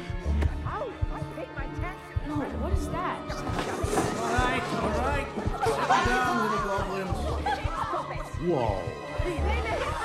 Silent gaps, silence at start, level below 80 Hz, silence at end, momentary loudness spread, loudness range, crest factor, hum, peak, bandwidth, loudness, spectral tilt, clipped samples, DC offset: none; 0 s; -36 dBFS; 0 s; 9 LU; 5 LU; 18 dB; none; -10 dBFS; 14.5 kHz; -29 LUFS; -5.5 dB/octave; under 0.1%; under 0.1%